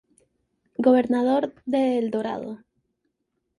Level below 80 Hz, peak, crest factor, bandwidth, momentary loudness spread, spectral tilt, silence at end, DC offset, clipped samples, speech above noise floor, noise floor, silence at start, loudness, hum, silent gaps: -68 dBFS; -6 dBFS; 18 dB; 10.5 kHz; 17 LU; -7 dB/octave; 1.05 s; under 0.1%; under 0.1%; 55 dB; -77 dBFS; 0.8 s; -23 LUFS; none; none